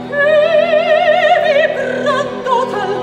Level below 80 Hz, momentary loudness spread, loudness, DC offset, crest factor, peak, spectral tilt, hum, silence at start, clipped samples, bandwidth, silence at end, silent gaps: -54 dBFS; 6 LU; -13 LUFS; under 0.1%; 12 dB; -2 dBFS; -4.5 dB/octave; none; 0 s; under 0.1%; 9.4 kHz; 0 s; none